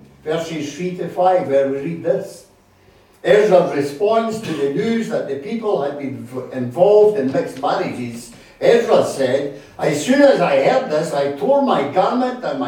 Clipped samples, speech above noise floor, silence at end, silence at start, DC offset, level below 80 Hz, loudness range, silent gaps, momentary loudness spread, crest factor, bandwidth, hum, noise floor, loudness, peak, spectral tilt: under 0.1%; 34 dB; 0 s; 0.25 s; under 0.1%; -60 dBFS; 3 LU; none; 13 LU; 16 dB; 16 kHz; none; -51 dBFS; -17 LUFS; 0 dBFS; -5.5 dB/octave